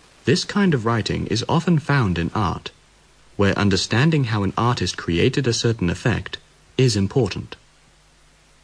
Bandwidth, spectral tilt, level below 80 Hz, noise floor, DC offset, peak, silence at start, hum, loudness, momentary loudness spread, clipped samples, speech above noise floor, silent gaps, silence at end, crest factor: 11 kHz; -5.5 dB/octave; -46 dBFS; -54 dBFS; under 0.1%; -6 dBFS; 0.25 s; none; -20 LUFS; 11 LU; under 0.1%; 34 dB; none; 1.1 s; 16 dB